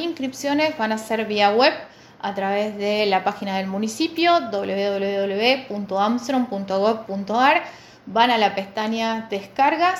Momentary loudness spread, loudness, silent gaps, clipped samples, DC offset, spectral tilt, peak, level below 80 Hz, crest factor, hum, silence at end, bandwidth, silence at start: 9 LU; -21 LUFS; none; under 0.1%; under 0.1%; -4.5 dB/octave; -2 dBFS; -66 dBFS; 18 dB; none; 0 s; 16.5 kHz; 0 s